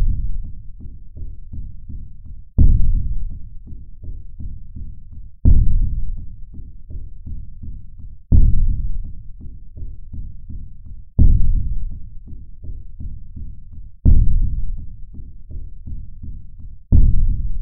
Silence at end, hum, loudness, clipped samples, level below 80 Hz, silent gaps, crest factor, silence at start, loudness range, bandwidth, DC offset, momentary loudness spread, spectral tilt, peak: 0 s; none; -21 LUFS; under 0.1%; -20 dBFS; none; 14 dB; 0 s; 1 LU; 0.9 kHz; under 0.1%; 23 LU; -15.5 dB/octave; -2 dBFS